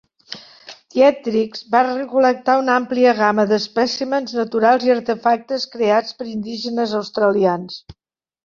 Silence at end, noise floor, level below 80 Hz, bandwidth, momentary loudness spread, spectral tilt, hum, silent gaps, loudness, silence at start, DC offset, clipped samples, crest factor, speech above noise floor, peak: 0.5 s; -42 dBFS; -60 dBFS; 7.2 kHz; 12 LU; -5 dB/octave; none; none; -18 LUFS; 0.3 s; under 0.1%; under 0.1%; 16 dB; 25 dB; -2 dBFS